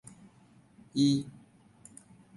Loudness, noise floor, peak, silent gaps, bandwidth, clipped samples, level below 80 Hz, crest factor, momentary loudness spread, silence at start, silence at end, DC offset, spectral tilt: -29 LUFS; -61 dBFS; -16 dBFS; none; 11.5 kHz; under 0.1%; -70 dBFS; 20 dB; 26 LU; 0.95 s; 1.05 s; under 0.1%; -6 dB/octave